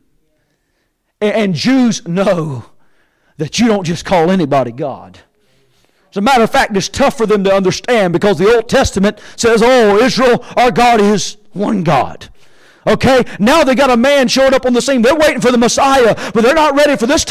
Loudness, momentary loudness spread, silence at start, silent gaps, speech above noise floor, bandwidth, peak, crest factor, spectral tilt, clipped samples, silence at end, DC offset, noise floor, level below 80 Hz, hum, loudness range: -11 LUFS; 8 LU; 1.2 s; none; 53 dB; 16 kHz; -4 dBFS; 8 dB; -4.5 dB/octave; under 0.1%; 0 s; under 0.1%; -64 dBFS; -38 dBFS; none; 6 LU